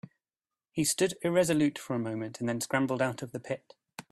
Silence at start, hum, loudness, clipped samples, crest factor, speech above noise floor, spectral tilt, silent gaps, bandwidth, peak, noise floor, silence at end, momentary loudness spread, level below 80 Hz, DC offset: 0.75 s; none; -30 LUFS; under 0.1%; 18 dB; over 60 dB; -4.5 dB/octave; none; 15 kHz; -12 dBFS; under -90 dBFS; 0.1 s; 12 LU; -68 dBFS; under 0.1%